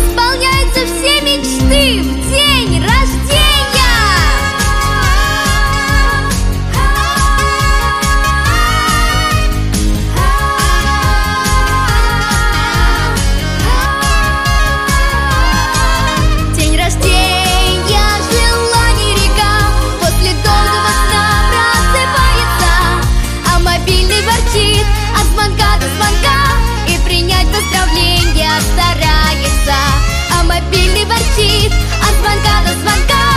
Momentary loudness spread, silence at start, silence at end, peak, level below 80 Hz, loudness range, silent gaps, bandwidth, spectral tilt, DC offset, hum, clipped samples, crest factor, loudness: 3 LU; 0 s; 0 s; 0 dBFS; -14 dBFS; 2 LU; none; 15.5 kHz; -3.5 dB/octave; under 0.1%; none; under 0.1%; 10 dB; -11 LUFS